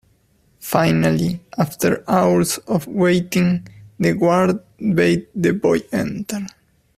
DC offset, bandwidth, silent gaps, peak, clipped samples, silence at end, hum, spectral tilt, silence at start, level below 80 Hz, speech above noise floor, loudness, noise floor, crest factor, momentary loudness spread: under 0.1%; 15.5 kHz; none; 0 dBFS; under 0.1%; 0.5 s; none; -6 dB/octave; 0.6 s; -50 dBFS; 41 dB; -19 LUFS; -59 dBFS; 18 dB; 9 LU